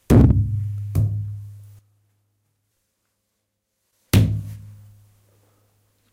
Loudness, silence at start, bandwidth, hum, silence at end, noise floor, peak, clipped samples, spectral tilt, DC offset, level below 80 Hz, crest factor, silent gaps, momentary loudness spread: -20 LUFS; 0.1 s; 16 kHz; none; 1.4 s; -76 dBFS; -2 dBFS; under 0.1%; -7.5 dB/octave; under 0.1%; -32 dBFS; 20 dB; none; 23 LU